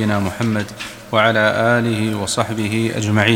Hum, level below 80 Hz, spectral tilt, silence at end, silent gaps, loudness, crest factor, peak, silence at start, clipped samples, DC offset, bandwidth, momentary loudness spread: none; -50 dBFS; -5 dB/octave; 0 s; none; -18 LUFS; 18 dB; 0 dBFS; 0 s; under 0.1%; under 0.1%; 16.5 kHz; 6 LU